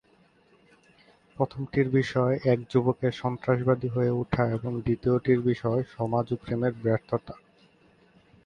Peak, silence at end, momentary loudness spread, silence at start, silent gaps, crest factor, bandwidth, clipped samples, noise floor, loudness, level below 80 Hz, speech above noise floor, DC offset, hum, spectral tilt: -10 dBFS; 1.1 s; 6 LU; 1.4 s; none; 18 dB; 7.2 kHz; under 0.1%; -62 dBFS; -27 LUFS; -54 dBFS; 36 dB; under 0.1%; none; -9 dB/octave